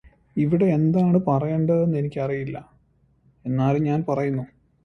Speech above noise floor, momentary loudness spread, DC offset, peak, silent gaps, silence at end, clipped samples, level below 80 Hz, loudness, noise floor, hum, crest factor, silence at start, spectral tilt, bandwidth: 40 dB; 13 LU; under 0.1%; -8 dBFS; none; 0.4 s; under 0.1%; -54 dBFS; -22 LUFS; -61 dBFS; none; 14 dB; 0.35 s; -10.5 dB/octave; 6.4 kHz